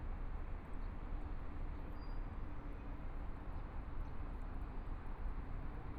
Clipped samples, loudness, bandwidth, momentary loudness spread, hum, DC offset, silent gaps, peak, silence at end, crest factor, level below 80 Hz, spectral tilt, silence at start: under 0.1%; -50 LUFS; 5 kHz; 2 LU; none; under 0.1%; none; -32 dBFS; 0 s; 12 dB; -44 dBFS; -8.5 dB/octave; 0 s